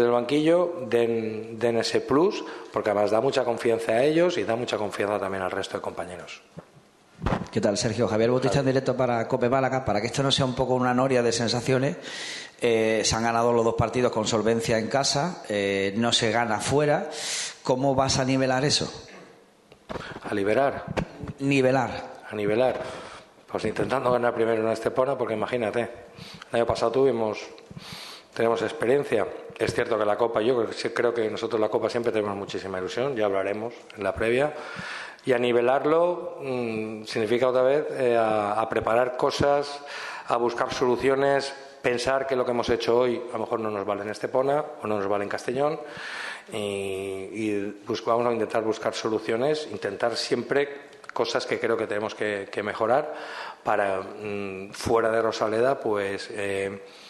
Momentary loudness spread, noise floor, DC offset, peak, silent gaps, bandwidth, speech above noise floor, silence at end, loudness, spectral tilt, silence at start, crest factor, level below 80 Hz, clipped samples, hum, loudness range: 11 LU; -55 dBFS; under 0.1%; -8 dBFS; none; 12.5 kHz; 30 dB; 0 s; -25 LUFS; -4.5 dB/octave; 0 s; 18 dB; -54 dBFS; under 0.1%; none; 4 LU